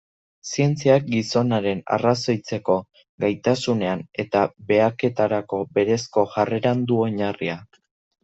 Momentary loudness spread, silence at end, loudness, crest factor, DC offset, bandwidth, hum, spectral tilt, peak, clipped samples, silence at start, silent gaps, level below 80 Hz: 7 LU; 0.6 s; -22 LUFS; 18 dB; under 0.1%; 8.2 kHz; none; -6 dB/octave; -4 dBFS; under 0.1%; 0.45 s; 3.09-3.18 s; -62 dBFS